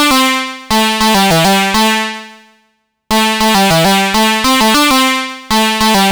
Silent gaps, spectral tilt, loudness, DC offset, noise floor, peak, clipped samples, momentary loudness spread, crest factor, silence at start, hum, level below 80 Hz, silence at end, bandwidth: none; -3 dB/octave; -10 LUFS; under 0.1%; -60 dBFS; -4 dBFS; under 0.1%; 7 LU; 8 dB; 0 s; 50 Hz at -50 dBFS; -36 dBFS; 0 s; over 20 kHz